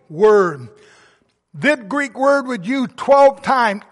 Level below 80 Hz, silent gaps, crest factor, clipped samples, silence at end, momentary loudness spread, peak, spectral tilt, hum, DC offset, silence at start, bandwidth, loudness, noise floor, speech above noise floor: -60 dBFS; none; 14 dB; under 0.1%; 0.15 s; 10 LU; -2 dBFS; -5.5 dB/octave; none; under 0.1%; 0.1 s; 11.5 kHz; -16 LUFS; -57 dBFS; 41 dB